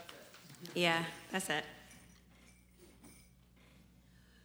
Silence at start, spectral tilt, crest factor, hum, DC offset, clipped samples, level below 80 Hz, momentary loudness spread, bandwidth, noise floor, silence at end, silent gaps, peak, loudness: 0 s; -3.5 dB/octave; 26 dB; none; under 0.1%; under 0.1%; -70 dBFS; 27 LU; over 20 kHz; -64 dBFS; 0.6 s; none; -16 dBFS; -36 LUFS